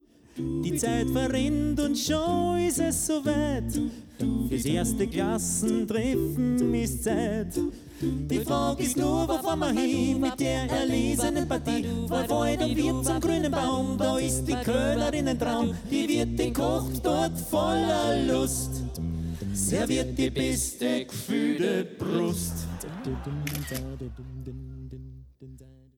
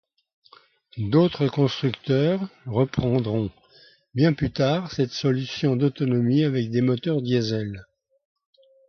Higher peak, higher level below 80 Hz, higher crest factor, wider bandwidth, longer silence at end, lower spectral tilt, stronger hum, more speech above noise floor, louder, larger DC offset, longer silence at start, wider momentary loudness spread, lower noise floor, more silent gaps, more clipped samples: second, -14 dBFS vs -6 dBFS; first, -40 dBFS vs -52 dBFS; about the same, 14 dB vs 18 dB; first, 18.5 kHz vs 6.6 kHz; second, 0.3 s vs 1.05 s; second, -5 dB/octave vs -7.5 dB/octave; neither; second, 22 dB vs 33 dB; second, -27 LUFS vs -23 LUFS; neither; second, 0.35 s vs 0.95 s; about the same, 8 LU vs 8 LU; second, -49 dBFS vs -55 dBFS; neither; neither